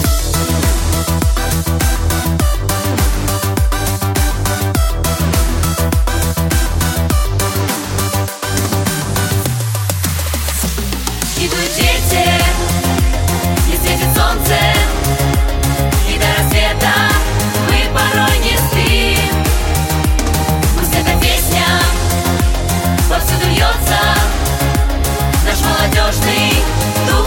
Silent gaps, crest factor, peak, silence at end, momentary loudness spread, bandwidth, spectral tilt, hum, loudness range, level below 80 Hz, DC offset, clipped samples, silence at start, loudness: none; 12 dB; 0 dBFS; 0 s; 4 LU; 17 kHz; -4 dB/octave; none; 3 LU; -18 dBFS; under 0.1%; under 0.1%; 0 s; -14 LUFS